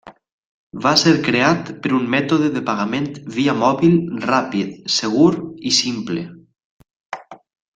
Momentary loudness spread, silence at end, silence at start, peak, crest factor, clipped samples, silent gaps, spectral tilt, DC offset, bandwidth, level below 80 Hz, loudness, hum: 12 LU; 0.4 s; 0.05 s; 0 dBFS; 18 dB; under 0.1%; 0.32-0.70 s, 6.64-6.79 s, 6.96-7.10 s; -4.5 dB/octave; under 0.1%; 9.2 kHz; -58 dBFS; -18 LUFS; none